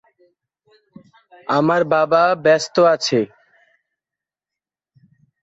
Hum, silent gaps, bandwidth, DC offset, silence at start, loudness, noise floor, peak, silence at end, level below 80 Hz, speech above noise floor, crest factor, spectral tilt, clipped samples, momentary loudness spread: none; none; 8 kHz; under 0.1%; 1.5 s; -16 LUFS; -88 dBFS; -2 dBFS; 2.15 s; -66 dBFS; 72 dB; 18 dB; -4.5 dB/octave; under 0.1%; 7 LU